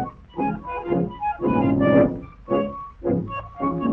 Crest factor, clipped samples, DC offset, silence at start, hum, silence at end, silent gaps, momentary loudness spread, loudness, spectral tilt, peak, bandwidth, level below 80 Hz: 18 dB; under 0.1%; under 0.1%; 0 s; none; 0 s; none; 12 LU; -23 LUFS; -10.5 dB/octave; -4 dBFS; 3.7 kHz; -46 dBFS